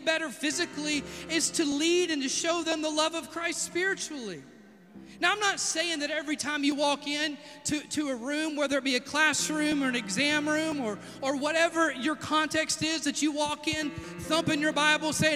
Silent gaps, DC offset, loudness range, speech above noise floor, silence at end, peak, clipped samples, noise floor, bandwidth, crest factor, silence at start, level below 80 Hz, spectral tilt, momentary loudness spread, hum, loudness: none; under 0.1%; 3 LU; 22 dB; 0 s; -10 dBFS; under 0.1%; -51 dBFS; 15.5 kHz; 20 dB; 0 s; -64 dBFS; -2.5 dB/octave; 8 LU; none; -28 LUFS